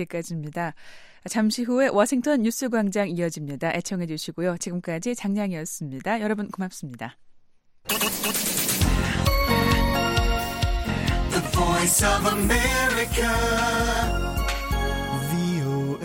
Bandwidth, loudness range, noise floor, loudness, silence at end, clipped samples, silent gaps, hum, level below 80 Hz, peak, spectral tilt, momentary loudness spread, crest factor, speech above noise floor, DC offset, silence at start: 17 kHz; 7 LU; -54 dBFS; -24 LUFS; 0 s; under 0.1%; none; none; -32 dBFS; -6 dBFS; -4 dB/octave; 10 LU; 18 dB; 29 dB; under 0.1%; 0 s